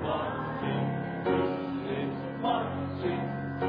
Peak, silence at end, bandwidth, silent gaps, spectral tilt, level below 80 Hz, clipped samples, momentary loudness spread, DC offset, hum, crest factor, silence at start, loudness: -16 dBFS; 0 s; 5.2 kHz; none; -10 dB/octave; -58 dBFS; under 0.1%; 5 LU; under 0.1%; none; 14 dB; 0 s; -32 LUFS